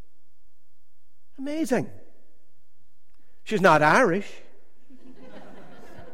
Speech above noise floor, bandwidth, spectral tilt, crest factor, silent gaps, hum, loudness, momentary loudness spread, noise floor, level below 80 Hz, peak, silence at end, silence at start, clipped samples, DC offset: 41 dB; 16.5 kHz; -5.5 dB/octave; 24 dB; none; none; -22 LUFS; 22 LU; -63 dBFS; -60 dBFS; -4 dBFS; 0.1 s; 1.4 s; under 0.1%; 2%